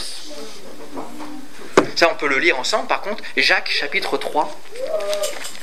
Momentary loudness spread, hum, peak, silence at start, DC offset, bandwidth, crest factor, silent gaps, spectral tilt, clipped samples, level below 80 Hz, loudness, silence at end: 19 LU; none; 0 dBFS; 0 s; 5%; 16 kHz; 22 dB; none; -2 dB/octave; under 0.1%; -62 dBFS; -19 LUFS; 0 s